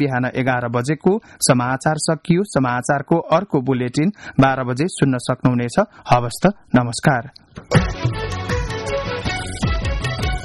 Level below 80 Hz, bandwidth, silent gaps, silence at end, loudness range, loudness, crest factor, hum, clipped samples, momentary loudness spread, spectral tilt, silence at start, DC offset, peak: -32 dBFS; 12 kHz; none; 0 s; 3 LU; -19 LUFS; 16 dB; none; under 0.1%; 7 LU; -5.5 dB/octave; 0 s; under 0.1%; -2 dBFS